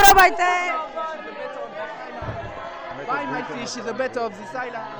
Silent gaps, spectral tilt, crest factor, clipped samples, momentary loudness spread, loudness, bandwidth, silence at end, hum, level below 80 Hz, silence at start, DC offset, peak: none; -2.5 dB/octave; 22 dB; under 0.1%; 16 LU; -23 LUFS; 14 kHz; 0 s; none; -42 dBFS; 0 s; 0.2%; 0 dBFS